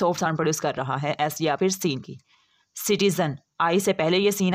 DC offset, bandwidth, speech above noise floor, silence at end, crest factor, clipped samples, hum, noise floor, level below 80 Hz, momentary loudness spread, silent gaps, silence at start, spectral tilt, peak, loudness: under 0.1%; 16 kHz; 25 dB; 0 s; 14 dB; under 0.1%; none; -49 dBFS; -66 dBFS; 8 LU; none; 0 s; -4.5 dB/octave; -10 dBFS; -24 LUFS